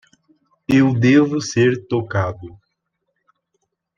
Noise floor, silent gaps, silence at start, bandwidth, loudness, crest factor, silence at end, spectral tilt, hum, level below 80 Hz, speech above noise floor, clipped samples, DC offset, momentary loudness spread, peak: -74 dBFS; none; 0.7 s; 7.6 kHz; -17 LUFS; 16 dB; 1.5 s; -6.5 dB/octave; none; -56 dBFS; 58 dB; under 0.1%; under 0.1%; 12 LU; -2 dBFS